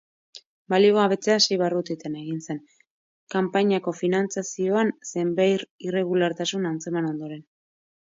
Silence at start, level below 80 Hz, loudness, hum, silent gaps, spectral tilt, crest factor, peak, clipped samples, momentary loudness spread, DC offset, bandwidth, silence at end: 0.35 s; -74 dBFS; -24 LUFS; none; 0.46-0.65 s, 2.90-3.27 s, 5.70-5.79 s; -4.5 dB/octave; 18 dB; -6 dBFS; under 0.1%; 12 LU; under 0.1%; 7.8 kHz; 0.8 s